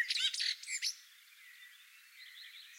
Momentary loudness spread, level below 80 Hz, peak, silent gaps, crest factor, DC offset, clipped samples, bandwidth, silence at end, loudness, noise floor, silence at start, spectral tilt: 24 LU; under -90 dBFS; -22 dBFS; none; 20 dB; under 0.1%; under 0.1%; 16 kHz; 0 s; -35 LUFS; -60 dBFS; 0 s; 11 dB/octave